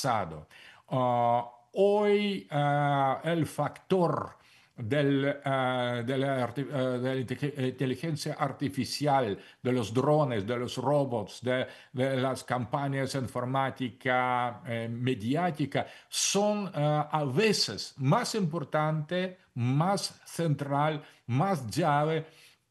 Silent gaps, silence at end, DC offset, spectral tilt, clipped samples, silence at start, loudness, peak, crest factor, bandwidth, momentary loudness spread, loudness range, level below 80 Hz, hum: none; 0.4 s; under 0.1%; -5.5 dB/octave; under 0.1%; 0 s; -30 LUFS; -12 dBFS; 18 dB; 12.5 kHz; 8 LU; 3 LU; -70 dBFS; none